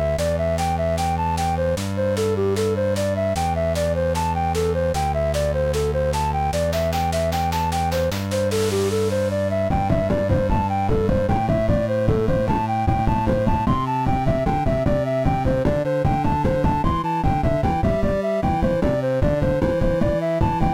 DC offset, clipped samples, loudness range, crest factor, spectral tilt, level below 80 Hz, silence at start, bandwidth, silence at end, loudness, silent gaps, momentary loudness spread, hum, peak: under 0.1%; under 0.1%; 1 LU; 12 dB; -6.5 dB/octave; -30 dBFS; 0 s; 16.5 kHz; 0 s; -21 LUFS; none; 2 LU; none; -8 dBFS